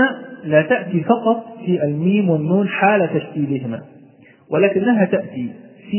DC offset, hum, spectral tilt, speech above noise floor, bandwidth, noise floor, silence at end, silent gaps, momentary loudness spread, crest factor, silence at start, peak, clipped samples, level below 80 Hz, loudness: under 0.1%; none; -11.5 dB/octave; 30 dB; 3.2 kHz; -47 dBFS; 0 s; none; 12 LU; 18 dB; 0 s; 0 dBFS; under 0.1%; -66 dBFS; -18 LUFS